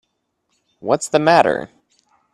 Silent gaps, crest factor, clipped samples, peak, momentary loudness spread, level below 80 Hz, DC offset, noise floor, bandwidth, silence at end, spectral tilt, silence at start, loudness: none; 20 dB; under 0.1%; 0 dBFS; 17 LU; -60 dBFS; under 0.1%; -71 dBFS; 12.5 kHz; 0.7 s; -4.5 dB/octave; 0.85 s; -16 LUFS